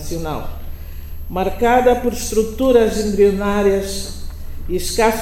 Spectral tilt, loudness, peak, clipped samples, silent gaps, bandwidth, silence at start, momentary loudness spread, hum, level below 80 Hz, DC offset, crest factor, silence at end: -5 dB/octave; -17 LUFS; 0 dBFS; under 0.1%; none; 17.5 kHz; 0 s; 20 LU; none; -28 dBFS; under 0.1%; 16 dB; 0 s